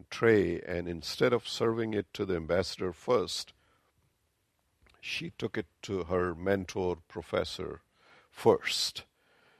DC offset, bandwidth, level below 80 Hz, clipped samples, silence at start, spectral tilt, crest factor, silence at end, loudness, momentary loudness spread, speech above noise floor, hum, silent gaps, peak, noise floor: under 0.1%; 14 kHz; -54 dBFS; under 0.1%; 0.1 s; -4.5 dB/octave; 24 dB; 0.55 s; -31 LUFS; 12 LU; 45 dB; none; none; -8 dBFS; -76 dBFS